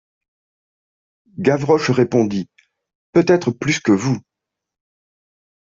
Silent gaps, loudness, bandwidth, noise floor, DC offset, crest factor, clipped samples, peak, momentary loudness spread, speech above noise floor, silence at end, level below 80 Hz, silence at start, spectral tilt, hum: 2.95-3.13 s; -18 LUFS; 7.8 kHz; under -90 dBFS; under 0.1%; 18 dB; under 0.1%; -2 dBFS; 11 LU; over 74 dB; 1.45 s; -58 dBFS; 1.35 s; -6 dB/octave; none